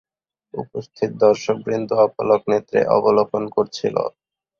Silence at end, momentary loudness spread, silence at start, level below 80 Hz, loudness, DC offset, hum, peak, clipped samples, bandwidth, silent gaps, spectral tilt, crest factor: 0.5 s; 13 LU; 0.55 s; -60 dBFS; -19 LUFS; under 0.1%; none; -2 dBFS; under 0.1%; 7.2 kHz; none; -6 dB/octave; 18 dB